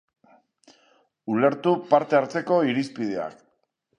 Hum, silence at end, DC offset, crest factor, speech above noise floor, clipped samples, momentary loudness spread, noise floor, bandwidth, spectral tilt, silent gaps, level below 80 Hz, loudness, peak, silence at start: none; 0.65 s; under 0.1%; 20 dB; 49 dB; under 0.1%; 11 LU; -71 dBFS; 10 kHz; -7 dB/octave; none; -74 dBFS; -23 LUFS; -4 dBFS; 1.25 s